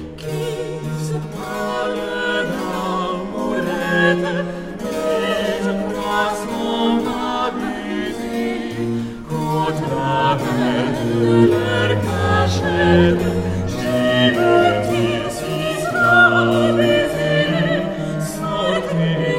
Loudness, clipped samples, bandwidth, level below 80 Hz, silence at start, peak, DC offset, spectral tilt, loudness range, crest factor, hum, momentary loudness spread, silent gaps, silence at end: -18 LUFS; under 0.1%; 16 kHz; -44 dBFS; 0 s; -2 dBFS; under 0.1%; -6 dB/octave; 6 LU; 18 dB; none; 10 LU; none; 0 s